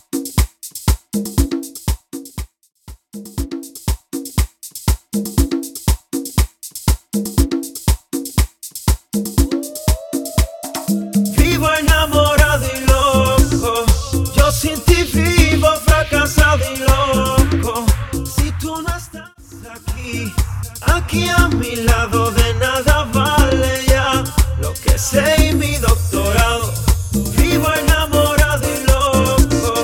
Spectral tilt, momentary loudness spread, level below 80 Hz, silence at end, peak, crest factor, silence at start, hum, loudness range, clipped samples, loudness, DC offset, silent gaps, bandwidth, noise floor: -4.5 dB/octave; 11 LU; -20 dBFS; 0 s; 0 dBFS; 16 dB; 0.15 s; none; 8 LU; under 0.1%; -16 LUFS; under 0.1%; none; 17.5 kHz; -36 dBFS